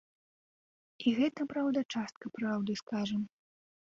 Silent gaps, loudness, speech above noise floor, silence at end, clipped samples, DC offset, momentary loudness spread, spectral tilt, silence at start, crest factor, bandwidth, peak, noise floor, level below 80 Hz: 1.85-1.89 s, 2.16-2.21 s, 2.83-2.87 s; -34 LUFS; over 57 dB; 0.6 s; under 0.1%; under 0.1%; 8 LU; -5.5 dB/octave; 1 s; 18 dB; 7.6 kHz; -18 dBFS; under -90 dBFS; -74 dBFS